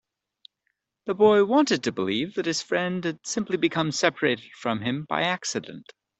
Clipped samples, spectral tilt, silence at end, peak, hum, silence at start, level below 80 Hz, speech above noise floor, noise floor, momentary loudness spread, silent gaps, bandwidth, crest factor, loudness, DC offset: under 0.1%; -4 dB/octave; 0.4 s; -4 dBFS; none; 1.05 s; -68 dBFS; 53 dB; -78 dBFS; 11 LU; none; 8.4 kHz; 20 dB; -25 LUFS; under 0.1%